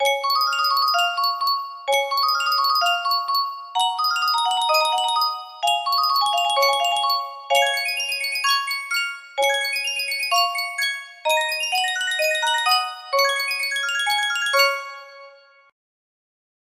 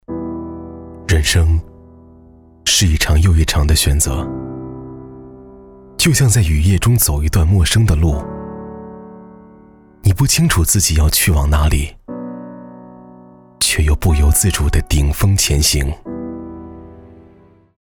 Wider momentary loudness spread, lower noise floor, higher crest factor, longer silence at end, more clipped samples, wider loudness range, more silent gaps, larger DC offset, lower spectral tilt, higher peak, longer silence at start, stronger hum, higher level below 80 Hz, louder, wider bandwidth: second, 5 LU vs 19 LU; about the same, -48 dBFS vs -47 dBFS; first, 18 dB vs 12 dB; first, 1.4 s vs 0.8 s; neither; about the same, 2 LU vs 3 LU; neither; neither; second, 3.5 dB/octave vs -4 dB/octave; about the same, -4 dBFS vs -4 dBFS; about the same, 0 s vs 0.1 s; neither; second, -76 dBFS vs -20 dBFS; second, -20 LUFS vs -14 LUFS; second, 16 kHz vs 18.5 kHz